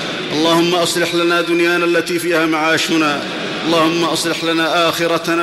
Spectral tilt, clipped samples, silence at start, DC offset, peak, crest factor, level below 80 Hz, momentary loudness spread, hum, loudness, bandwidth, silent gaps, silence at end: -3.5 dB/octave; under 0.1%; 0 s; under 0.1%; -4 dBFS; 12 dB; -58 dBFS; 3 LU; none; -15 LUFS; 15 kHz; none; 0 s